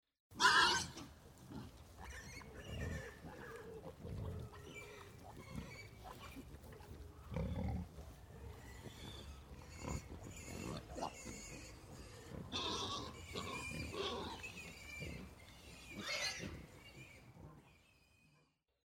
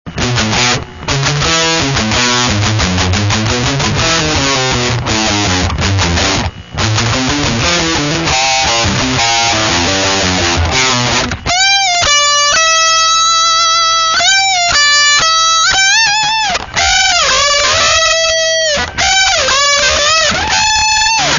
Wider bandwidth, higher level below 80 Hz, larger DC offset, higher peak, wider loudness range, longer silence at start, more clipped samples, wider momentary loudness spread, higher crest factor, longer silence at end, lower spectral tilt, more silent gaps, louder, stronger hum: first, 17.5 kHz vs 7.4 kHz; second, -58 dBFS vs -30 dBFS; neither; second, -16 dBFS vs 0 dBFS; first, 7 LU vs 4 LU; first, 0.3 s vs 0.05 s; neither; first, 16 LU vs 5 LU; first, 30 dB vs 12 dB; first, 1 s vs 0 s; about the same, -3 dB/octave vs -2 dB/octave; neither; second, -43 LUFS vs -9 LUFS; neither